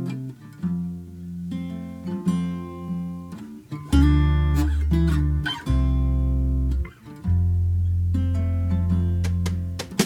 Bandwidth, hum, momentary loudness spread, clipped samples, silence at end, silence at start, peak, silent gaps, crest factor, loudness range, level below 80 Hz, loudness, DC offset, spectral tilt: 14 kHz; none; 14 LU; under 0.1%; 0 s; 0 s; -4 dBFS; none; 18 dB; 8 LU; -26 dBFS; -24 LUFS; under 0.1%; -7 dB/octave